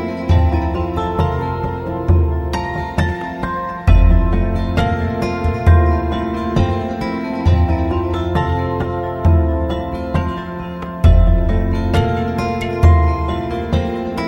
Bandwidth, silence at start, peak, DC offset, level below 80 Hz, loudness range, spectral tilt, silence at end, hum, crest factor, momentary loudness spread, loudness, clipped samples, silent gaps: 7 kHz; 0 s; 0 dBFS; under 0.1%; -20 dBFS; 2 LU; -8 dB/octave; 0 s; none; 14 dB; 9 LU; -17 LUFS; under 0.1%; none